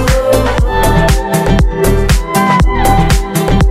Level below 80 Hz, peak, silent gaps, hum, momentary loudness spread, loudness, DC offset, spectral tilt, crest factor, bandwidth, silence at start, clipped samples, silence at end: -14 dBFS; 0 dBFS; none; none; 2 LU; -11 LUFS; 3%; -5.5 dB/octave; 10 dB; 16 kHz; 0 s; under 0.1%; 0 s